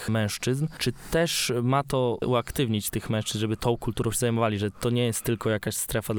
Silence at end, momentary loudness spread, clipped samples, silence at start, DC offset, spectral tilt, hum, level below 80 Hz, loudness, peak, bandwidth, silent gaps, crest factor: 0 s; 4 LU; under 0.1%; 0 s; under 0.1%; -5 dB/octave; none; -46 dBFS; -26 LUFS; -12 dBFS; over 20 kHz; none; 14 dB